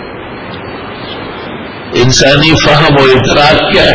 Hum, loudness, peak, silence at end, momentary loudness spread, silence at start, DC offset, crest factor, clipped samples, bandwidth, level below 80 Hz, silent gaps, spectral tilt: none; -6 LUFS; 0 dBFS; 0 s; 17 LU; 0 s; under 0.1%; 8 dB; 1%; 8 kHz; -28 dBFS; none; -4.5 dB/octave